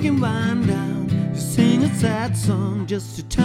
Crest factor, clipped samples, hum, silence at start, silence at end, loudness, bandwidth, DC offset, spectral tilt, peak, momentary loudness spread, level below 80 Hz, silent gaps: 16 dB; under 0.1%; none; 0 s; 0 s; -21 LUFS; 16 kHz; under 0.1%; -6.5 dB/octave; -4 dBFS; 8 LU; -40 dBFS; none